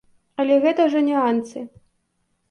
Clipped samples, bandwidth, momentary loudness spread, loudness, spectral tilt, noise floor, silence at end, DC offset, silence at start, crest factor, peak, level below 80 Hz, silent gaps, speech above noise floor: under 0.1%; 9.8 kHz; 18 LU; -19 LUFS; -5.5 dB/octave; -70 dBFS; 0.85 s; under 0.1%; 0.4 s; 14 dB; -6 dBFS; -68 dBFS; none; 51 dB